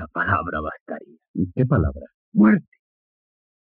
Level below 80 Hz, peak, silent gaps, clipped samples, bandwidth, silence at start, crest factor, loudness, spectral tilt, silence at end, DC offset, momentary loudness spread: -40 dBFS; -6 dBFS; 0.80-0.86 s, 1.28-1.34 s, 2.14-2.32 s; under 0.1%; 3.5 kHz; 0 s; 18 dB; -21 LUFS; -8 dB/octave; 1.1 s; under 0.1%; 19 LU